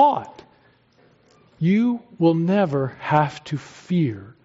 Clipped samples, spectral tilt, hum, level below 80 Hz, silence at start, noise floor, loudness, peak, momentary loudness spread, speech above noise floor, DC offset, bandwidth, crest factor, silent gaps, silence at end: under 0.1%; -7 dB/octave; none; -64 dBFS; 0 s; -57 dBFS; -22 LUFS; -4 dBFS; 12 LU; 37 dB; under 0.1%; 7.8 kHz; 18 dB; none; 0.15 s